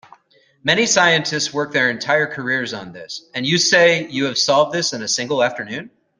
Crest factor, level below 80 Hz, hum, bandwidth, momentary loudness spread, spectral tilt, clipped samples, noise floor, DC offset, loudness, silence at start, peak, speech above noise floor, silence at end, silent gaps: 18 dB; -62 dBFS; none; 11 kHz; 15 LU; -2.5 dB/octave; under 0.1%; -56 dBFS; under 0.1%; -17 LUFS; 0.65 s; -2 dBFS; 38 dB; 0.3 s; none